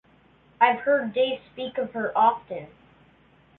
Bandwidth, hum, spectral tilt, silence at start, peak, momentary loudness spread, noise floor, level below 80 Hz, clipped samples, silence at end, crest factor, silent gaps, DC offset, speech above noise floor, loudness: 4.2 kHz; none; -8 dB/octave; 0.6 s; -6 dBFS; 13 LU; -58 dBFS; -66 dBFS; under 0.1%; 0.95 s; 20 dB; none; under 0.1%; 34 dB; -24 LUFS